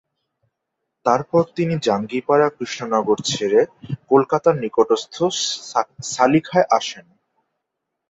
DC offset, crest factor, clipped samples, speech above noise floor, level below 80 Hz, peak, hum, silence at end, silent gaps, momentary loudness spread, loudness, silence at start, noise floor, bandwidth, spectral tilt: under 0.1%; 18 dB; under 0.1%; 61 dB; -60 dBFS; -2 dBFS; none; 1.1 s; none; 8 LU; -19 LUFS; 1.05 s; -79 dBFS; 8 kHz; -4.5 dB/octave